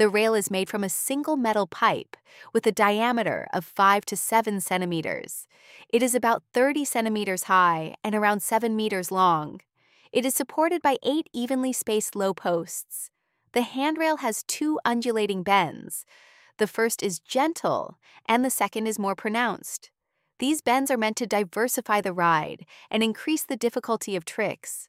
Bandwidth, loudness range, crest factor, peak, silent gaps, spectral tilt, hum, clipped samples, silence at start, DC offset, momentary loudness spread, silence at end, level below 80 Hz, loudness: 16 kHz; 3 LU; 20 dB; -6 dBFS; none; -3.5 dB/octave; none; under 0.1%; 0 s; under 0.1%; 9 LU; 0.05 s; -72 dBFS; -25 LUFS